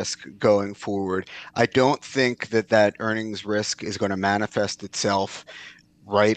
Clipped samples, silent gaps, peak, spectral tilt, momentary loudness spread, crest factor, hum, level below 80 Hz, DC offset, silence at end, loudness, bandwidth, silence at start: under 0.1%; none; -4 dBFS; -4.5 dB/octave; 10 LU; 20 dB; none; -66 dBFS; under 0.1%; 0 s; -24 LUFS; 9.4 kHz; 0 s